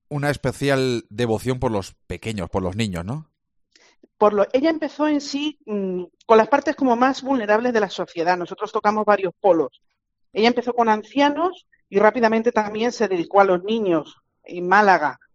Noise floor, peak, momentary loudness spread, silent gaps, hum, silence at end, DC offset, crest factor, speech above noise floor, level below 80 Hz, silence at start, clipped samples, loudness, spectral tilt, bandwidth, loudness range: -61 dBFS; 0 dBFS; 11 LU; none; none; 0.2 s; under 0.1%; 20 dB; 41 dB; -52 dBFS; 0.1 s; under 0.1%; -20 LUFS; -5.5 dB/octave; 13 kHz; 5 LU